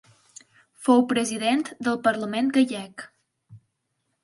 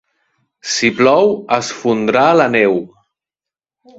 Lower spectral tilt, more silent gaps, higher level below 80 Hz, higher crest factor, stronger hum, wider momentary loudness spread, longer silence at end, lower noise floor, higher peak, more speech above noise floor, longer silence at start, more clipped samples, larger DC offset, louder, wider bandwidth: about the same, -4 dB/octave vs -4 dB/octave; neither; second, -72 dBFS vs -58 dBFS; about the same, 18 dB vs 16 dB; neither; first, 12 LU vs 8 LU; second, 0.65 s vs 1.1 s; second, -76 dBFS vs -88 dBFS; second, -8 dBFS vs 0 dBFS; second, 53 dB vs 74 dB; first, 0.8 s vs 0.65 s; neither; neither; second, -23 LUFS vs -13 LUFS; first, 11.5 kHz vs 8 kHz